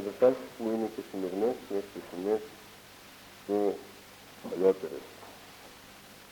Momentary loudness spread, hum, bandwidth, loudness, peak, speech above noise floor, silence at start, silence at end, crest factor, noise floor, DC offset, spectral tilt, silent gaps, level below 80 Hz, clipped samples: 22 LU; none; 19 kHz; -32 LUFS; -12 dBFS; 21 dB; 0 s; 0 s; 22 dB; -52 dBFS; under 0.1%; -5.5 dB/octave; none; -70 dBFS; under 0.1%